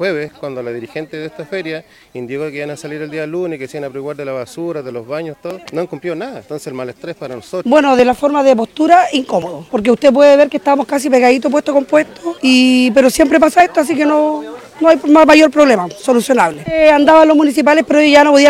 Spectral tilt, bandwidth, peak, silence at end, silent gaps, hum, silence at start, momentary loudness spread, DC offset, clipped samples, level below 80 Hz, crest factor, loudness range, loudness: -4.5 dB/octave; 15.5 kHz; 0 dBFS; 0 s; none; none; 0 s; 18 LU; under 0.1%; 0.3%; -48 dBFS; 12 dB; 14 LU; -11 LUFS